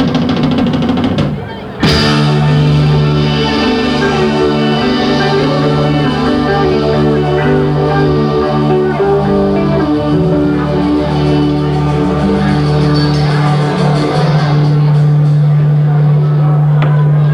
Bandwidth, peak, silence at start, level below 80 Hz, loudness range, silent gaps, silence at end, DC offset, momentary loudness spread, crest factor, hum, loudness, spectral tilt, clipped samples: 9.6 kHz; 0 dBFS; 0 s; -30 dBFS; 2 LU; none; 0 s; under 0.1%; 3 LU; 10 dB; none; -11 LUFS; -7.5 dB/octave; under 0.1%